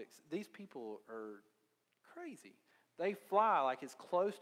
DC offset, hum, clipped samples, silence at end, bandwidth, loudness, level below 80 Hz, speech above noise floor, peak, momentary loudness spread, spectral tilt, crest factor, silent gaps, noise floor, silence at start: under 0.1%; none; under 0.1%; 0 s; 16 kHz; -38 LUFS; under -90 dBFS; 38 dB; -18 dBFS; 20 LU; -5 dB/octave; 22 dB; none; -77 dBFS; 0 s